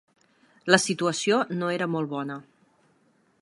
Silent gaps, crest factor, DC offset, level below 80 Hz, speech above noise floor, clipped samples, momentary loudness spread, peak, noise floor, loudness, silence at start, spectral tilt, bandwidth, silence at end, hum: none; 26 dB; under 0.1%; -76 dBFS; 40 dB; under 0.1%; 15 LU; 0 dBFS; -65 dBFS; -25 LUFS; 0.65 s; -4 dB/octave; 11.5 kHz; 1 s; none